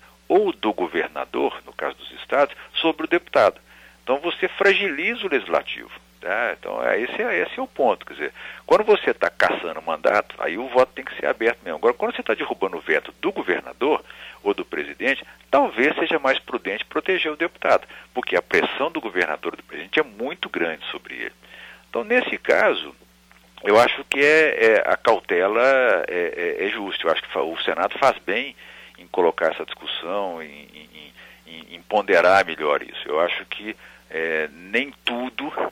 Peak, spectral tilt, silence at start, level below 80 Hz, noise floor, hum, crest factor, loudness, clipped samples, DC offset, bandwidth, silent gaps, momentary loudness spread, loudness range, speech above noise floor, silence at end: -4 dBFS; -4 dB/octave; 0.3 s; -60 dBFS; -53 dBFS; none; 18 dB; -22 LUFS; under 0.1%; under 0.1%; 15.5 kHz; none; 14 LU; 6 LU; 31 dB; 0 s